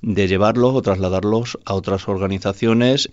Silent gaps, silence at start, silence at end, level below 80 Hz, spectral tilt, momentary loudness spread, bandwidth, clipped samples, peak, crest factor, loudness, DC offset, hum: none; 0.05 s; 0.05 s; -48 dBFS; -6 dB/octave; 7 LU; 8 kHz; under 0.1%; -2 dBFS; 14 dB; -18 LUFS; under 0.1%; none